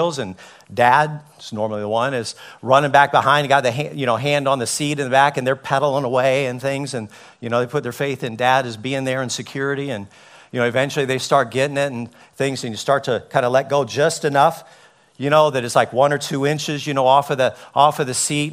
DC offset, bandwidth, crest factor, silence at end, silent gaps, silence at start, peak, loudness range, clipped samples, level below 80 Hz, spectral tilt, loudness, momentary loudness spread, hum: under 0.1%; 16 kHz; 20 dB; 0 s; none; 0 s; 0 dBFS; 5 LU; under 0.1%; -62 dBFS; -4 dB/octave; -19 LUFS; 11 LU; none